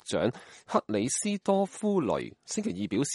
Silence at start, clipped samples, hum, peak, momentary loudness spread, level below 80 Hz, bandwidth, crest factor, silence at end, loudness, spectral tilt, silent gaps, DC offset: 0.05 s; under 0.1%; none; -10 dBFS; 6 LU; -64 dBFS; 11.5 kHz; 20 dB; 0 s; -30 LUFS; -4.5 dB/octave; none; under 0.1%